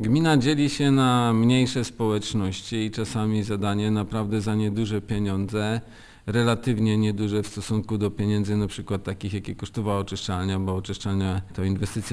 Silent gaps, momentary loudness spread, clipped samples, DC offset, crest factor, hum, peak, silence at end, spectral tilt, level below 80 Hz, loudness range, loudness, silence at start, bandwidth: none; 9 LU; under 0.1%; under 0.1%; 16 dB; none; -8 dBFS; 0 s; -6 dB/octave; -48 dBFS; 5 LU; -25 LUFS; 0 s; 11 kHz